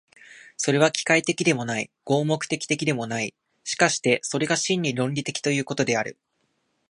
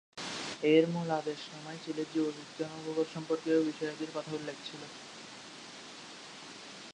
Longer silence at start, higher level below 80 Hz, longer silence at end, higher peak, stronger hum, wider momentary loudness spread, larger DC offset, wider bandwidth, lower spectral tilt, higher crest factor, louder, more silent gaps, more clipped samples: first, 0.3 s vs 0.15 s; first, -68 dBFS vs -80 dBFS; first, 0.8 s vs 0 s; first, -2 dBFS vs -14 dBFS; neither; second, 9 LU vs 19 LU; neither; about the same, 11 kHz vs 10.5 kHz; about the same, -4 dB/octave vs -5 dB/octave; about the same, 22 dB vs 22 dB; first, -24 LUFS vs -34 LUFS; neither; neither